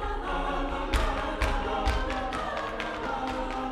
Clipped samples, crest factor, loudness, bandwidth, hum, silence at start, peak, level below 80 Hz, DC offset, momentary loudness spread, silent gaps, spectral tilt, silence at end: under 0.1%; 18 dB; -31 LUFS; 14 kHz; none; 0 s; -12 dBFS; -34 dBFS; under 0.1%; 3 LU; none; -5 dB/octave; 0 s